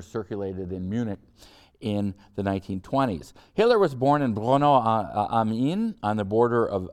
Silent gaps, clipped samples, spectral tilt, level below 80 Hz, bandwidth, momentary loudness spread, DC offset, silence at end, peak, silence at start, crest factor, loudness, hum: none; under 0.1%; -7.5 dB/octave; -56 dBFS; 13 kHz; 12 LU; under 0.1%; 0.05 s; -8 dBFS; 0 s; 18 dB; -25 LUFS; none